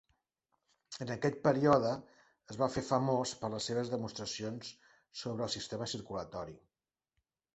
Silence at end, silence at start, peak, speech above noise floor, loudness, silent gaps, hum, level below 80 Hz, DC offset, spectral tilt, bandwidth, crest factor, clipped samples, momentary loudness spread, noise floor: 1 s; 0.9 s; -12 dBFS; 51 dB; -35 LUFS; none; none; -68 dBFS; under 0.1%; -5 dB/octave; 8.2 kHz; 24 dB; under 0.1%; 16 LU; -86 dBFS